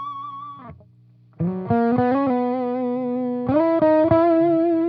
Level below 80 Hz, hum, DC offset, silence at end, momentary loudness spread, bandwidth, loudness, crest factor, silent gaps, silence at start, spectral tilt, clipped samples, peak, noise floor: -56 dBFS; 60 Hz at -45 dBFS; under 0.1%; 0 s; 16 LU; 5 kHz; -20 LUFS; 16 dB; none; 0 s; -11 dB/octave; under 0.1%; -4 dBFS; -52 dBFS